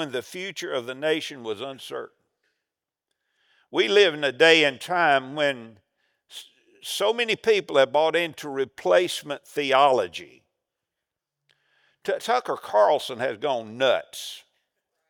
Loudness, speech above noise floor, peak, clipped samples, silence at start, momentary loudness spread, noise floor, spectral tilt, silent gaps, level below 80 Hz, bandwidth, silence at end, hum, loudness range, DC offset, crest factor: -23 LUFS; 63 dB; -2 dBFS; under 0.1%; 0 s; 17 LU; -87 dBFS; -3 dB/octave; none; -80 dBFS; over 20 kHz; 0.7 s; none; 6 LU; under 0.1%; 24 dB